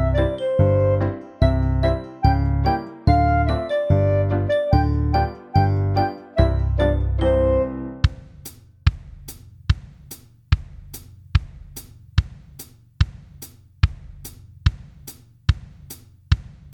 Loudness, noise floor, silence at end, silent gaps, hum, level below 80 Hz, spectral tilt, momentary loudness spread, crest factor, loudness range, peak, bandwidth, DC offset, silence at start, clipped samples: -21 LUFS; -44 dBFS; 0.05 s; none; none; -26 dBFS; -7.5 dB/octave; 21 LU; 20 dB; 9 LU; -2 dBFS; 19 kHz; under 0.1%; 0 s; under 0.1%